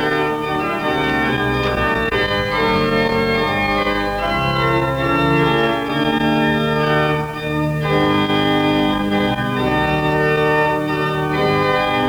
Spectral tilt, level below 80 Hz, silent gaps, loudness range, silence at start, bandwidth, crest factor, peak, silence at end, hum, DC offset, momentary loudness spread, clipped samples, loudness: -6.5 dB/octave; -36 dBFS; none; 1 LU; 0 s; over 20 kHz; 14 dB; -4 dBFS; 0 s; none; under 0.1%; 3 LU; under 0.1%; -17 LUFS